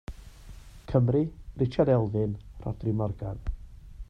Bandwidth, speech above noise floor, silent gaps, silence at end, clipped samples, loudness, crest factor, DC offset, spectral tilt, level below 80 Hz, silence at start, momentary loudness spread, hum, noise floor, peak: 7.2 kHz; 20 dB; none; 0.05 s; under 0.1%; -28 LUFS; 20 dB; under 0.1%; -10 dB/octave; -42 dBFS; 0.1 s; 21 LU; none; -46 dBFS; -10 dBFS